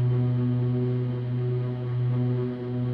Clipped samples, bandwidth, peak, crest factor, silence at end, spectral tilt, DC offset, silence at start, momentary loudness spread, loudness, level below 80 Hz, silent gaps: under 0.1%; 4.4 kHz; -16 dBFS; 10 dB; 0 s; -11.5 dB/octave; under 0.1%; 0 s; 4 LU; -27 LUFS; -56 dBFS; none